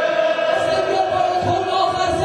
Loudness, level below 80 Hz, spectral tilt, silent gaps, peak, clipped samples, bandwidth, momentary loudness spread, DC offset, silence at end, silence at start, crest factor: -18 LUFS; -46 dBFS; -4.5 dB/octave; none; -6 dBFS; under 0.1%; 10 kHz; 1 LU; under 0.1%; 0 s; 0 s; 12 dB